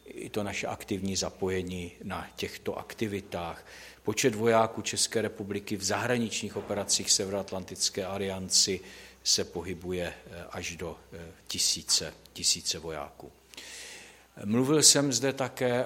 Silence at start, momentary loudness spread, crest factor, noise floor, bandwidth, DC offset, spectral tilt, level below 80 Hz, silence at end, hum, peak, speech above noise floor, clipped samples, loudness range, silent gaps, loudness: 0.05 s; 18 LU; 24 dB; -49 dBFS; 16.5 kHz; under 0.1%; -2.5 dB/octave; -60 dBFS; 0 s; none; -6 dBFS; 19 dB; under 0.1%; 7 LU; none; -28 LUFS